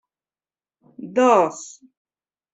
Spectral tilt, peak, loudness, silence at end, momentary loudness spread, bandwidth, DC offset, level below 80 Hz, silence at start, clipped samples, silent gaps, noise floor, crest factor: -4.5 dB/octave; -4 dBFS; -18 LUFS; 0.85 s; 23 LU; 8.2 kHz; under 0.1%; -70 dBFS; 1 s; under 0.1%; none; under -90 dBFS; 20 dB